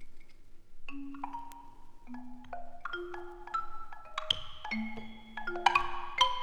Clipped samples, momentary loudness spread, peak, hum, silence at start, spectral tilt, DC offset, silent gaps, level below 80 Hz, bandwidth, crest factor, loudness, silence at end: under 0.1%; 20 LU; -8 dBFS; none; 0 s; -2.5 dB/octave; under 0.1%; none; -50 dBFS; 11.5 kHz; 28 dB; -35 LUFS; 0 s